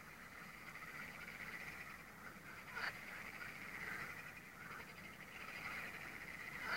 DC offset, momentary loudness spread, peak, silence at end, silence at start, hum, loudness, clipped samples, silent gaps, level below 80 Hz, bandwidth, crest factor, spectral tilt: under 0.1%; 8 LU; -28 dBFS; 0 s; 0 s; none; -50 LUFS; under 0.1%; none; -72 dBFS; 16 kHz; 24 dB; -3 dB/octave